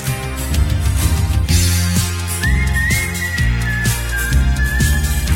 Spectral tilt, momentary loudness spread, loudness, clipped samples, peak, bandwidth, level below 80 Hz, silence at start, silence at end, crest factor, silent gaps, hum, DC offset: -4 dB/octave; 4 LU; -17 LUFS; under 0.1%; -2 dBFS; 16.5 kHz; -20 dBFS; 0 s; 0 s; 14 dB; none; none; under 0.1%